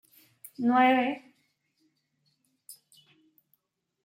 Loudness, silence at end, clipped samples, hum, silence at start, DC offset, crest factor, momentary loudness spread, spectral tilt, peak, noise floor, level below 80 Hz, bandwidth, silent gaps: -25 LUFS; 1.3 s; under 0.1%; none; 0.6 s; under 0.1%; 20 dB; 20 LU; -4.5 dB/octave; -12 dBFS; -75 dBFS; -86 dBFS; 16.5 kHz; none